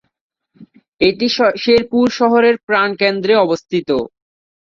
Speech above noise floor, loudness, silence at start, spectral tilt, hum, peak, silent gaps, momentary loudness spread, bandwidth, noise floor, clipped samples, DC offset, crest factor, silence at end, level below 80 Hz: 31 dB; -14 LUFS; 0.6 s; -5 dB/octave; none; -2 dBFS; 0.88-0.98 s, 2.63-2.67 s; 7 LU; 7.2 kHz; -45 dBFS; under 0.1%; under 0.1%; 14 dB; 0.6 s; -52 dBFS